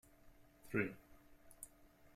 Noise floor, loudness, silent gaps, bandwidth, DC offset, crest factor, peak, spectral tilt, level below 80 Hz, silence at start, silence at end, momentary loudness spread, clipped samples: -66 dBFS; -45 LUFS; none; 16 kHz; under 0.1%; 24 dB; -24 dBFS; -6 dB/octave; -70 dBFS; 0.25 s; 0.05 s; 24 LU; under 0.1%